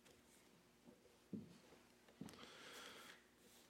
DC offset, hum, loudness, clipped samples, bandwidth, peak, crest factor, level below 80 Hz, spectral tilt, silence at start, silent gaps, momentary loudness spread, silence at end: under 0.1%; none; -61 LUFS; under 0.1%; 16 kHz; -40 dBFS; 22 dB; -86 dBFS; -4 dB/octave; 0 s; none; 13 LU; 0 s